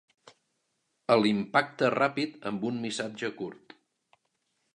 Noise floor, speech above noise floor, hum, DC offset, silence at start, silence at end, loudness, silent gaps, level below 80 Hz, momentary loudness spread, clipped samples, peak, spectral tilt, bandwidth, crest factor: -78 dBFS; 50 dB; none; under 0.1%; 1.1 s; 1.2 s; -28 LUFS; none; -76 dBFS; 12 LU; under 0.1%; -8 dBFS; -5 dB/octave; 11 kHz; 22 dB